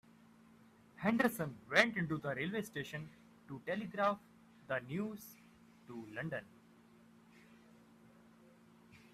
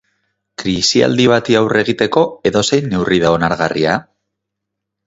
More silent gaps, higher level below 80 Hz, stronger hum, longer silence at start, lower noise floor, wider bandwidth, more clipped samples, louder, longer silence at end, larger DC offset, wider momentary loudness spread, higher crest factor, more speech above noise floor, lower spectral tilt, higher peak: neither; second, -76 dBFS vs -44 dBFS; neither; first, 1 s vs 0.6 s; second, -64 dBFS vs -78 dBFS; first, 15.5 kHz vs 8 kHz; neither; second, -38 LUFS vs -14 LUFS; second, 0.15 s vs 1.05 s; neither; first, 19 LU vs 6 LU; first, 30 dB vs 16 dB; second, 26 dB vs 65 dB; about the same, -5.5 dB/octave vs -4.5 dB/octave; second, -10 dBFS vs 0 dBFS